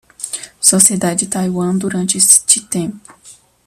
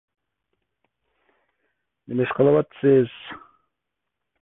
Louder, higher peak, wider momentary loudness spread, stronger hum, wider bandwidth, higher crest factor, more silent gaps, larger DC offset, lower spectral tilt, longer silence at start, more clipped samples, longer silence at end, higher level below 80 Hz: first, -12 LUFS vs -21 LUFS; first, 0 dBFS vs -6 dBFS; second, 16 LU vs 20 LU; neither; first, over 20 kHz vs 3.9 kHz; about the same, 16 dB vs 20 dB; neither; neither; second, -3 dB/octave vs -11.5 dB/octave; second, 0.2 s vs 2.1 s; first, 0.2% vs under 0.1%; second, 0.35 s vs 1.05 s; first, -56 dBFS vs -64 dBFS